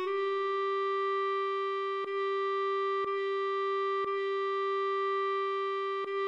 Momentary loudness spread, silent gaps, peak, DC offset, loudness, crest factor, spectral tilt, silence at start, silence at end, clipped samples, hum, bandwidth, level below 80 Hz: 2 LU; none; -24 dBFS; under 0.1%; -32 LUFS; 6 dB; -3.5 dB/octave; 0 s; 0 s; under 0.1%; none; 7 kHz; -84 dBFS